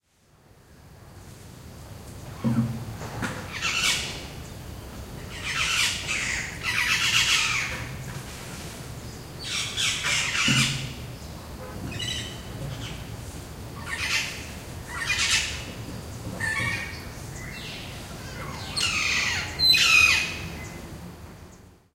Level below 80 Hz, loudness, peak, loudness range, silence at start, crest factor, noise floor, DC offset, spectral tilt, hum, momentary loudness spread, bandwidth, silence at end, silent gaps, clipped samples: -46 dBFS; -24 LUFS; -6 dBFS; 10 LU; 0.7 s; 22 dB; -59 dBFS; under 0.1%; -2 dB/octave; none; 19 LU; 16 kHz; 0.2 s; none; under 0.1%